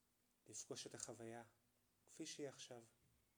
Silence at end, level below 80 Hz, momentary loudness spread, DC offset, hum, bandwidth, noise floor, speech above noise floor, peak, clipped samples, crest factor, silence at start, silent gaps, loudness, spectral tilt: 0.2 s; under -90 dBFS; 10 LU; under 0.1%; none; over 20 kHz; -76 dBFS; 20 dB; -34 dBFS; under 0.1%; 24 dB; 0.45 s; none; -55 LUFS; -3 dB/octave